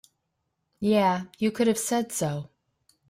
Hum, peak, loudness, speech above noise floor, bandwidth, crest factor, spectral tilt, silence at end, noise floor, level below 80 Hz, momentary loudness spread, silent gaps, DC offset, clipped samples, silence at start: none; -10 dBFS; -26 LUFS; 53 dB; 16 kHz; 18 dB; -5 dB/octave; 0.65 s; -78 dBFS; -66 dBFS; 9 LU; none; under 0.1%; under 0.1%; 0.8 s